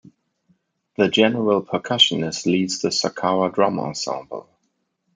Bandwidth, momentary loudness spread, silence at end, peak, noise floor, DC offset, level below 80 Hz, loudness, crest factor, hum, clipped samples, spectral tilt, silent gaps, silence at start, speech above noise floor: 9.6 kHz; 12 LU; 0.75 s; -2 dBFS; -72 dBFS; under 0.1%; -66 dBFS; -20 LUFS; 20 dB; none; under 0.1%; -4 dB/octave; none; 1 s; 52 dB